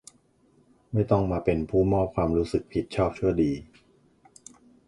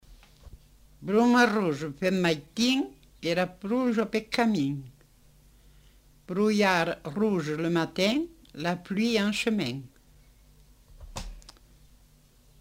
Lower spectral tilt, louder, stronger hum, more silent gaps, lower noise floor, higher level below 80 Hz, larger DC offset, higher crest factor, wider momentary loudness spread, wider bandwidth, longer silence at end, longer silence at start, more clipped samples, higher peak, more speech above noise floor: first, -8 dB/octave vs -5 dB/octave; about the same, -26 LUFS vs -27 LUFS; neither; neither; first, -63 dBFS vs -59 dBFS; first, -44 dBFS vs -54 dBFS; neither; about the same, 20 dB vs 20 dB; second, 5 LU vs 16 LU; second, 11.5 kHz vs 16 kHz; about the same, 1.25 s vs 1.2 s; first, 0.9 s vs 0.1 s; neither; about the same, -6 dBFS vs -8 dBFS; first, 38 dB vs 33 dB